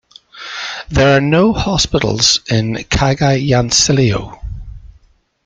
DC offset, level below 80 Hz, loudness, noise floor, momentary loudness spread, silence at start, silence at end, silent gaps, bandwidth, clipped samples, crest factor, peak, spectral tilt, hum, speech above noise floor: under 0.1%; -32 dBFS; -13 LUFS; -51 dBFS; 17 LU; 0.35 s; 0.6 s; none; 9.4 kHz; under 0.1%; 14 dB; 0 dBFS; -4 dB/octave; none; 38 dB